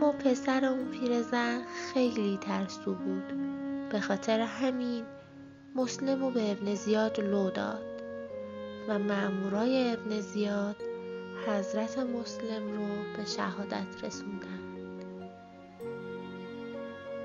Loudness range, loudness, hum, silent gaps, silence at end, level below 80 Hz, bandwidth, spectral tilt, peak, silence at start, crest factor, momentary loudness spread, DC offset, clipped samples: 6 LU; -33 LUFS; none; none; 0 s; -72 dBFS; 7.6 kHz; -5.5 dB/octave; -14 dBFS; 0 s; 18 dB; 13 LU; under 0.1%; under 0.1%